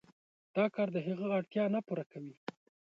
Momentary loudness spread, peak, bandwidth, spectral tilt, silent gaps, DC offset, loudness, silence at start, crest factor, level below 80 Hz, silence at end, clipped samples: 14 LU; -18 dBFS; 6.8 kHz; -8.5 dB/octave; 2.06-2.10 s; under 0.1%; -35 LUFS; 0.55 s; 18 dB; -84 dBFS; 0.6 s; under 0.1%